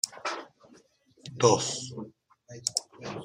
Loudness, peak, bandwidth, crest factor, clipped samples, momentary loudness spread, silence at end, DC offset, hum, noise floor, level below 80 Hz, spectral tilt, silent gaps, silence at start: -29 LUFS; -8 dBFS; 15 kHz; 24 dB; under 0.1%; 23 LU; 0 s; under 0.1%; none; -61 dBFS; -70 dBFS; -3 dB/octave; none; 0.05 s